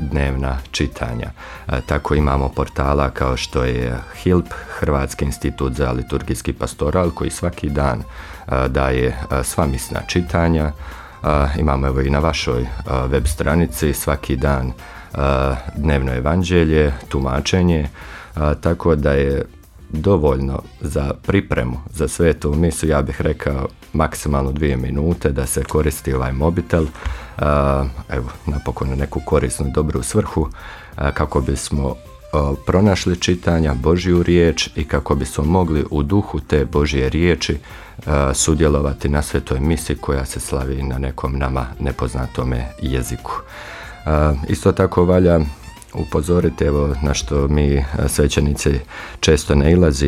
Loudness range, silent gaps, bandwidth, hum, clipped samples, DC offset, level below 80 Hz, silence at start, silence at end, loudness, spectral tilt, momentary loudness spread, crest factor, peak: 4 LU; none; 15 kHz; none; under 0.1%; under 0.1%; -26 dBFS; 0 s; 0 s; -19 LUFS; -6 dB/octave; 9 LU; 16 dB; -2 dBFS